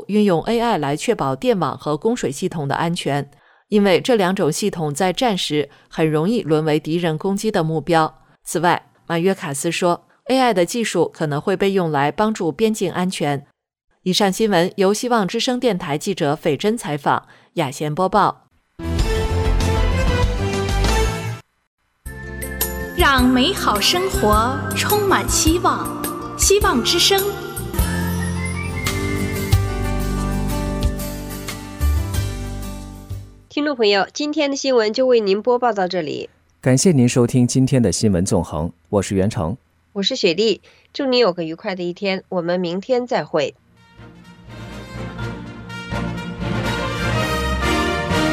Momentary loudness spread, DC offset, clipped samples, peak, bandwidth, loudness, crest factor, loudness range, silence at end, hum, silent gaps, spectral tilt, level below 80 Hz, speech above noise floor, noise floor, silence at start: 12 LU; under 0.1%; under 0.1%; -2 dBFS; 16.5 kHz; -19 LUFS; 16 dB; 6 LU; 0 s; none; 13.84-13.88 s, 21.67-21.78 s; -4.5 dB/octave; -30 dBFS; 26 dB; -44 dBFS; 0 s